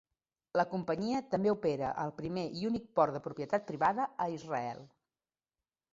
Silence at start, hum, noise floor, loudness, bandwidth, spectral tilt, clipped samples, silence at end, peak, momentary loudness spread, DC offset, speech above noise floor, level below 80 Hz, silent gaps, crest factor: 0.55 s; none; under -90 dBFS; -34 LUFS; 7.6 kHz; -5.5 dB/octave; under 0.1%; 1.05 s; -14 dBFS; 7 LU; under 0.1%; over 56 dB; -70 dBFS; none; 20 dB